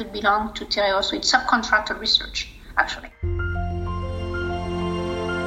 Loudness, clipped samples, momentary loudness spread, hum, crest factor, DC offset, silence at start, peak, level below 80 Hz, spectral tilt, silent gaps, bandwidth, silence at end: -23 LUFS; under 0.1%; 10 LU; none; 22 dB; under 0.1%; 0 s; -2 dBFS; -38 dBFS; -3.5 dB/octave; none; 14 kHz; 0 s